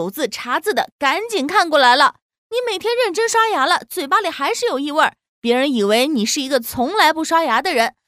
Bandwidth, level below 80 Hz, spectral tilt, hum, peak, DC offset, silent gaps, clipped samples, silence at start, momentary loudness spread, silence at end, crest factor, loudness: 16 kHz; -60 dBFS; -2.5 dB/octave; none; 0 dBFS; under 0.1%; 0.92-0.99 s, 2.22-2.29 s, 2.38-2.50 s, 5.29-5.42 s; under 0.1%; 0 s; 7 LU; 0.15 s; 18 dB; -17 LUFS